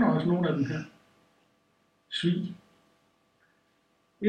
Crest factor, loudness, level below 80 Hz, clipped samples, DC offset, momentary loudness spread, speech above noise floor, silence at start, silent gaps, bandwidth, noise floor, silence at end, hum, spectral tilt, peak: 18 dB; -29 LUFS; -68 dBFS; under 0.1%; under 0.1%; 17 LU; 41 dB; 0 s; none; 9.2 kHz; -70 dBFS; 0 s; none; -7.5 dB/octave; -14 dBFS